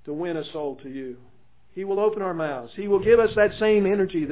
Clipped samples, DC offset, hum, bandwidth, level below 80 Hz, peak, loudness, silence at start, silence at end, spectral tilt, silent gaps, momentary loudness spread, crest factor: under 0.1%; 0.4%; none; 4 kHz; -52 dBFS; -6 dBFS; -23 LUFS; 0.05 s; 0 s; -10.5 dB/octave; none; 17 LU; 16 dB